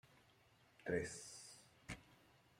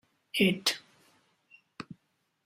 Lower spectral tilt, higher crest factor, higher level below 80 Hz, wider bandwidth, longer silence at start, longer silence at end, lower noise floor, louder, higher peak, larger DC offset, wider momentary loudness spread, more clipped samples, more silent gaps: about the same, -4 dB/octave vs -4 dB/octave; about the same, 24 dB vs 22 dB; about the same, -72 dBFS vs -70 dBFS; about the same, 16 kHz vs 16 kHz; second, 0.05 s vs 0.35 s; second, 0.25 s vs 0.5 s; second, -72 dBFS vs -76 dBFS; second, -48 LUFS vs -29 LUFS; second, -28 dBFS vs -12 dBFS; neither; second, 17 LU vs 22 LU; neither; neither